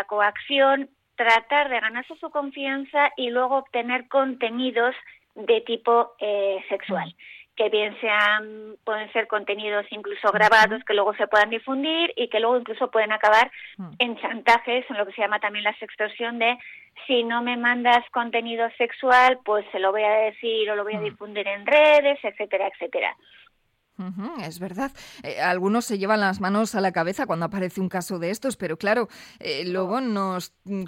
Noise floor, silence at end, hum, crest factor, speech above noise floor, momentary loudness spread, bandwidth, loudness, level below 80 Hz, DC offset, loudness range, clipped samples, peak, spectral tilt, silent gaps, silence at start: -69 dBFS; 0 s; none; 18 dB; 45 dB; 13 LU; 16.5 kHz; -23 LUFS; -66 dBFS; under 0.1%; 5 LU; under 0.1%; -6 dBFS; -4.5 dB/octave; none; 0 s